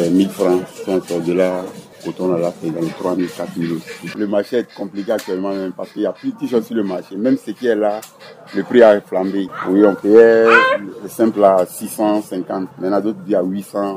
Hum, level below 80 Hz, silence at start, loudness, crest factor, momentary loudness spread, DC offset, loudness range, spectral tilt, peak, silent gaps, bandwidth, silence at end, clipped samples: none; -64 dBFS; 0 s; -17 LUFS; 16 dB; 14 LU; under 0.1%; 9 LU; -6 dB/octave; 0 dBFS; none; 16 kHz; 0 s; under 0.1%